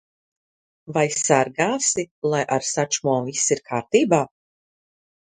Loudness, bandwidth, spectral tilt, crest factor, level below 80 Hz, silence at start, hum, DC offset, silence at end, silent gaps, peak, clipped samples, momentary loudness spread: -21 LUFS; 10.5 kHz; -3.5 dB/octave; 22 dB; -64 dBFS; 0.85 s; none; under 0.1%; 1.05 s; 2.11-2.22 s; -2 dBFS; under 0.1%; 6 LU